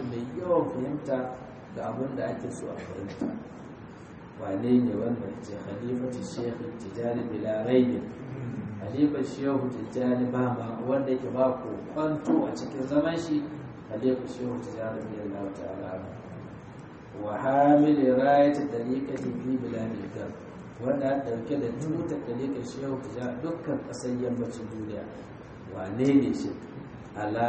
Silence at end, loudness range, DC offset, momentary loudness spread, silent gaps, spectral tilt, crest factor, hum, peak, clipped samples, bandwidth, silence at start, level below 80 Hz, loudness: 0 s; 9 LU; under 0.1%; 17 LU; none; -7.5 dB/octave; 20 dB; none; -8 dBFS; under 0.1%; 8.4 kHz; 0 s; -60 dBFS; -29 LUFS